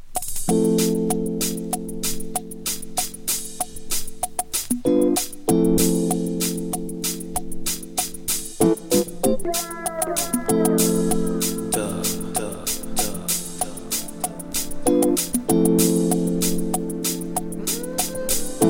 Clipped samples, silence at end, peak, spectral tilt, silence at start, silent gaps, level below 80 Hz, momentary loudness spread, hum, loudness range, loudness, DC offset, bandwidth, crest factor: under 0.1%; 0 s; -4 dBFS; -4 dB/octave; 0 s; none; -38 dBFS; 9 LU; none; 4 LU; -23 LUFS; under 0.1%; 16.5 kHz; 18 dB